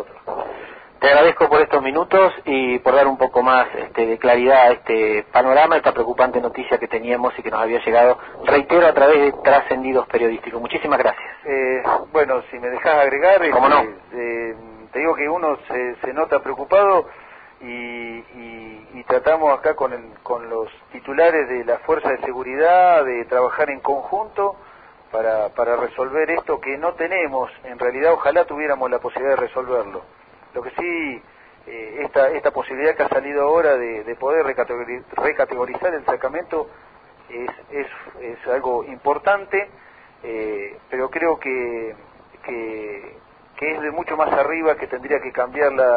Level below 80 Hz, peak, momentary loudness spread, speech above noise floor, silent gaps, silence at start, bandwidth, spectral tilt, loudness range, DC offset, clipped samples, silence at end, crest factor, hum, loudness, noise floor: -54 dBFS; -2 dBFS; 17 LU; 19 dB; none; 0 s; 5 kHz; -9.5 dB/octave; 9 LU; under 0.1%; under 0.1%; 0 s; 18 dB; none; -18 LUFS; -38 dBFS